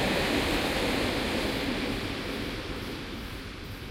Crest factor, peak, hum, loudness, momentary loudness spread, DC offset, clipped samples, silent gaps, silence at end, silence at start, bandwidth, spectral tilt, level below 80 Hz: 16 dB; -16 dBFS; none; -30 LUFS; 12 LU; under 0.1%; under 0.1%; none; 0 s; 0 s; 16 kHz; -4.5 dB/octave; -42 dBFS